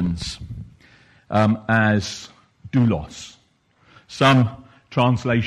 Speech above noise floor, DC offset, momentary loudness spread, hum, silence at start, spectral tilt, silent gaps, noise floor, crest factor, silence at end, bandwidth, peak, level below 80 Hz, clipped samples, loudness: 42 dB; under 0.1%; 21 LU; none; 0 s; -6 dB/octave; none; -60 dBFS; 18 dB; 0 s; 12 kHz; -4 dBFS; -46 dBFS; under 0.1%; -20 LUFS